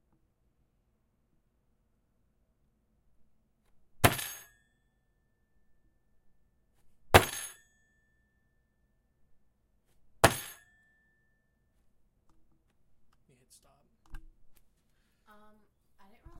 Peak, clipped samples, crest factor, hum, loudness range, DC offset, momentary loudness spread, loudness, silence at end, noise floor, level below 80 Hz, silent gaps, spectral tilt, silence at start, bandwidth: -2 dBFS; under 0.1%; 36 dB; none; 4 LU; under 0.1%; 21 LU; -28 LUFS; 1.85 s; -74 dBFS; -54 dBFS; none; -3.5 dB/octave; 4 s; 16 kHz